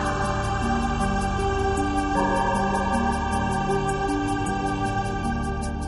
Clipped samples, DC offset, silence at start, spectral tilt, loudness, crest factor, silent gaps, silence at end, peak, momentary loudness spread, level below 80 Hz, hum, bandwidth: under 0.1%; under 0.1%; 0 s; -5.5 dB/octave; -25 LUFS; 14 dB; none; 0 s; -10 dBFS; 3 LU; -32 dBFS; none; 11.5 kHz